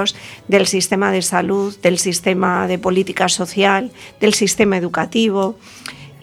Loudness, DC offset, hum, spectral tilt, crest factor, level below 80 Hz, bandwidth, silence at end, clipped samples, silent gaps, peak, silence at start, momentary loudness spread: -16 LUFS; under 0.1%; none; -3.5 dB/octave; 16 dB; -54 dBFS; 16 kHz; 0.05 s; under 0.1%; none; 0 dBFS; 0 s; 10 LU